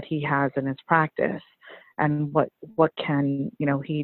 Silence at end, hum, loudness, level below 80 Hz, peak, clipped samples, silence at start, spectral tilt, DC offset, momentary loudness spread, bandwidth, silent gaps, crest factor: 0 s; none; -25 LUFS; -64 dBFS; -4 dBFS; under 0.1%; 0 s; -11 dB/octave; under 0.1%; 6 LU; 4.3 kHz; none; 20 dB